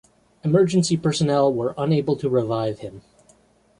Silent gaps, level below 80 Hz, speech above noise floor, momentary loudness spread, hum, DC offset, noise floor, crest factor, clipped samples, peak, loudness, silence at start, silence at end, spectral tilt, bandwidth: none; -56 dBFS; 37 dB; 10 LU; none; under 0.1%; -57 dBFS; 16 dB; under 0.1%; -6 dBFS; -21 LUFS; 0.45 s; 0.8 s; -6.5 dB/octave; 11 kHz